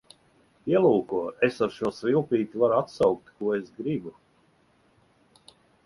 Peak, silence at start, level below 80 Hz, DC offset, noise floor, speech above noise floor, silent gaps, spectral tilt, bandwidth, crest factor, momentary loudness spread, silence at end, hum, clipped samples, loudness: -8 dBFS; 0.65 s; -64 dBFS; under 0.1%; -64 dBFS; 39 dB; none; -7.5 dB/octave; 11.5 kHz; 20 dB; 9 LU; 1.75 s; none; under 0.1%; -26 LUFS